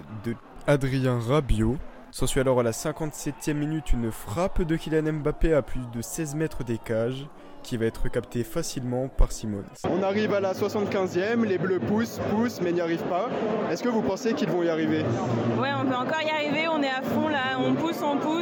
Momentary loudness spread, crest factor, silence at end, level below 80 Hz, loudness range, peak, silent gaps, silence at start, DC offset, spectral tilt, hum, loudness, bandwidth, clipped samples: 7 LU; 16 dB; 0 s; -36 dBFS; 4 LU; -10 dBFS; none; 0 s; under 0.1%; -6 dB/octave; none; -27 LUFS; 17.5 kHz; under 0.1%